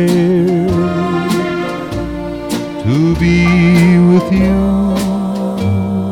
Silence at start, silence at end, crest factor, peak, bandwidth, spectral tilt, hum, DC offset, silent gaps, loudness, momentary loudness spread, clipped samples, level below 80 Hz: 0 s; 0 s; 10 dB; -2 dBFS; 14.5 kHz; -7.5 dB/octave; none; under 0.1%; none; -13 LUFS; 11 LU; under 0.1%; -30 dBFS